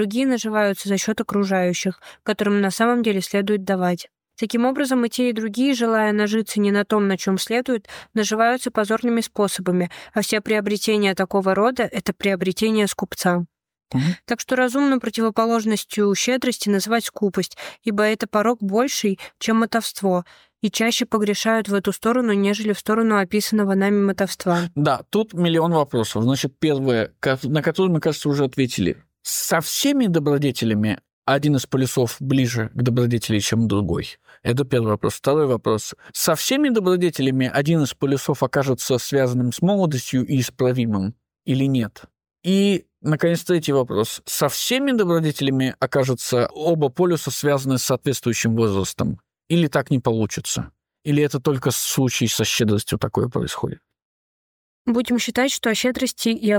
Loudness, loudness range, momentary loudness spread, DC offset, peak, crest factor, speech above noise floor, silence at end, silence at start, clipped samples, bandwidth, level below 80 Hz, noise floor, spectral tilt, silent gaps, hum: -21 LUFS; 2 LU; 6 LU; under 0.1%; -6 dBFS; 14 dB; over 70 dB; 0 s; 0 s; under 0.1%; over 20 kHz; -54 dBFS; under -90 dBFS; -5 dB/octave; 31.13-31.22 s, 54.02-54.85 s; none